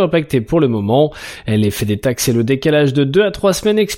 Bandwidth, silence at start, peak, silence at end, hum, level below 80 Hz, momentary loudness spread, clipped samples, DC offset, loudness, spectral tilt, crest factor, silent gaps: 17 kHz; 0 s; -2 dBFS; 0 s; none; -42 dBFS; 4 LU; under 0.1%; under 0.1%; -15 LUFS; -5.5 dB/octave; 12 dB; none